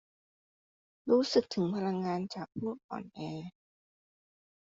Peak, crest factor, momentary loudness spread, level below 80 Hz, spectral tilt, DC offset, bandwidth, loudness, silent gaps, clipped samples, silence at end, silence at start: -14 dBFS; 22 dB; 16 LU; -74 dBFS; -5.5 dB/octave; under 0.1%; 7.8 kHz; -33 LUFS; 2.84-2.89 s; under 0.1%; 1.15 s; 1.05 s